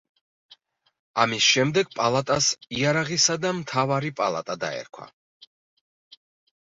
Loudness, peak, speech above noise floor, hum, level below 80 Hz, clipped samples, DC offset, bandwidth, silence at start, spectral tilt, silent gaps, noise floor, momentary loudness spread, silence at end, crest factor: -23 LUFS; -4 dBFS; 33 dB; none; -64 dBFS; under 0.1%; under 0.1%; 8 kHz; 0.5 s; -3 dB/octave; 0.99-1.14 s; -57 dBFS; 12 LU; 1.6 s; 22 dB